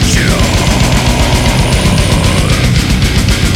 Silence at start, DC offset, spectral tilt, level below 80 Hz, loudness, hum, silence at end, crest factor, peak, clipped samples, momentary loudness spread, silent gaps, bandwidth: 0 s; under 0.1%; -4.5 dB/octave; -14 dBFS; -10 LUFS; none; 0 s; 10 dB; 0 dBFS; under 0.1%; 1 LU; none; 16.5 kHz